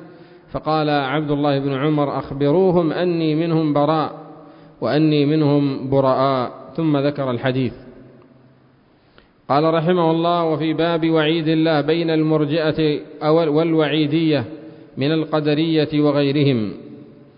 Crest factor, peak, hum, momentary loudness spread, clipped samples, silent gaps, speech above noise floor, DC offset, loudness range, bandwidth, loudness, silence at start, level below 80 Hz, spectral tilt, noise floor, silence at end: 14 dB; -4 dBFS; none; 7 LU; under 0.1%; none; 36 dB; under 0.1%; 4 LU; 5.4 kHz; -18 LUFS; 0 s; -54 dBFS; -12 dB/octave; -54 dBFS; 0.35 s